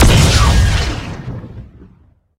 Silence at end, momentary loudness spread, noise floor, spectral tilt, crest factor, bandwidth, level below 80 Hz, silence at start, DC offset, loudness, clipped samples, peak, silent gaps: 0.75 s; 20 LU; -49 dBFS; -4.5 dB/octave; 14 dB; 16 kHz; -18 dBFS; 0 s; under 0.1%; -13 LUFS; under 0.1%; 0 dBFS; none